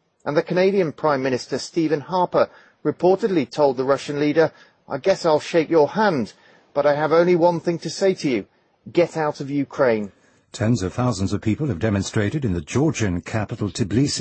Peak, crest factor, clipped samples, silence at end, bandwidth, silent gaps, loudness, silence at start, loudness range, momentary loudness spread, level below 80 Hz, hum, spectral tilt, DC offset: -4 dBFS; 16 dB; under 0.1%; 0 s; 8.8 kHz; none; -21 LUFS; 0.25 s; 3 LU; 8 LU; -52 dBFS; none; -6 dB/octave; under 0.1%